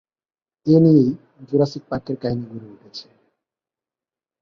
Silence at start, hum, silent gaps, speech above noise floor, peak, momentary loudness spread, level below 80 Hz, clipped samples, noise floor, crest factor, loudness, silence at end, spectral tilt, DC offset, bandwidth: 0.65 s; none; none; over 71 dB; -2 dBFS; 24 LU; -56 dBFS; under 0.1%; under -90 dBFS; 18 dB; -19 LUFS; 1.4 s; -9 dB/octave; under 0.1%; 6.6 kHz